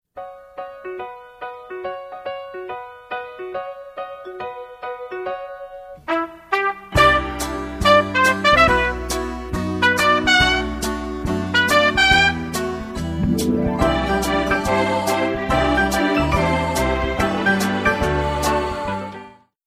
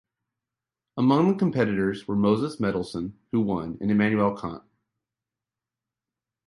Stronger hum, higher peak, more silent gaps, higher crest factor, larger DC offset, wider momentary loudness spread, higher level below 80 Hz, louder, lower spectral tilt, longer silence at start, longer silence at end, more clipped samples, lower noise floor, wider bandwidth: neither; first, -2 dBFS vs -8 dBFS; neither; about the same, 18 dB vs 18 dB; neither; first, 19 LU vs 13 LU; first, -34 dBFS vs -56 dBFS; first, -18 LUFS vs -25 LUFS; second, -4.5 dB/octave vs -8 dB/octave; second, 0.15 s vs 0.95 s; second, 0.35 s vs 1.9 s; neither; second, -41 dBFS vs -89 dBFS; first, 15 kHz vs 11.5 kHz